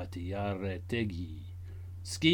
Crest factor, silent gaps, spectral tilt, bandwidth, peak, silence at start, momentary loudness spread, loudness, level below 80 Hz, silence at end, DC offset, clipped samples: 22 dB; none; -5 dB/octave; 18 kHz; -12 dBFS; 0 s; 11 LU; -37 LUFS; -54 dBFS; 0 s; under 0.1%; under 0.1%